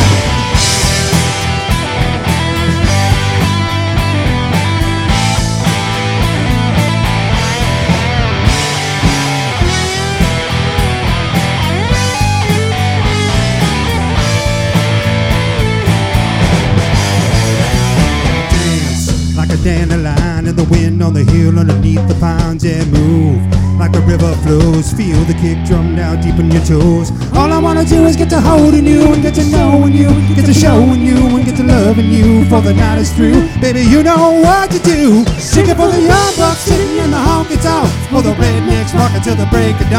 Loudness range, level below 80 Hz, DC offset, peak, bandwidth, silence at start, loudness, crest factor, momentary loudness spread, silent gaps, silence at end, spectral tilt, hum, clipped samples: 4 LU; -20 dBFS; under 0.1%; 0 dBFS; 16 kHz; 0 s; -11 LUFS; 10 dB; 5 LU; none; 0 s; -5.5 dB/octave; none; 0.7%